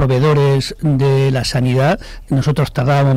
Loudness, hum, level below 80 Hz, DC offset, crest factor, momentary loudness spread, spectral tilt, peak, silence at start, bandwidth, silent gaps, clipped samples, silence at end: -15 LUFS; none; -34 dBFS; under 0.1%; 6 dB; 5 LU; -7 dB/octave; -6 dBFS; 0 s; 13 kHz; none; under 0.1%; 0 s